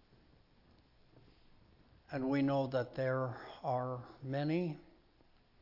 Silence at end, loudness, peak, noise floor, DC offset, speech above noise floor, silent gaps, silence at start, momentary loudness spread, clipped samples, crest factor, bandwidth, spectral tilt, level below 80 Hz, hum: 0.75 s; -37 LUFS; -24 dBFS; -67 dBFS; under 0.1%; 31 dB; none; 2.1 s; 10 LU; under 0.1%; 16 dB; 5.8 kHz; -6.5 dB/octave; -70 dBFS; none